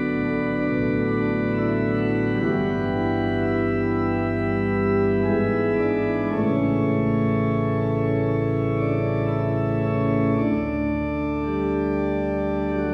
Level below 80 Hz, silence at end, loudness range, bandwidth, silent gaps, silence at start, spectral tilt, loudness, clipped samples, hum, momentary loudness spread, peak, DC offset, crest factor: -40 dBFS; 0 s; 1 LU; 5.6 kHz; none; 0 s; -10 dB/octave; -23 LUFS; under 0.1%; none; 3 LU; -10 dBFS; under 0.1%; 12 dB